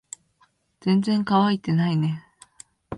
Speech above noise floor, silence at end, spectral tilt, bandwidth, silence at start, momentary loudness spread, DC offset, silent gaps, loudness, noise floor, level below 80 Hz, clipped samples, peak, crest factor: 43 dB; 0 s; -7 dB/octave; 11 kHz; 0.85 s; 16 LU; under 0.1%; none; -22 LUFS; -64 dBFS; -60 dBFS; under 0.1%; -8 dBFS; 16 dB